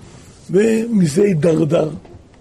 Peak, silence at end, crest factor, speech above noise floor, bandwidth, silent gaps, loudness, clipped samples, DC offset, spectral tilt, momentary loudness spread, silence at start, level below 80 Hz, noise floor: -4 dBFS; 0.25 s; 12 dB; 25 dB; 13.5 kHz; none; -16 LUFS; under 0.1%; under 0.1%; -7 dB/octave; 7 LU; 0.15 s; -50 dBFS; -39 dBFS